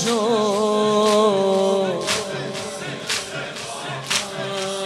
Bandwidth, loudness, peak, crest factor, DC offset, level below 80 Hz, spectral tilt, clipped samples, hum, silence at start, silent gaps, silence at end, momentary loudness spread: 15 kHz; -21 LUFS; -4 dBFS; 18 dB; under 0.1%; -62 dBFS; -3.5 dB/octave; under 0.1%; none; 0 s; none; 0 s; 12 LU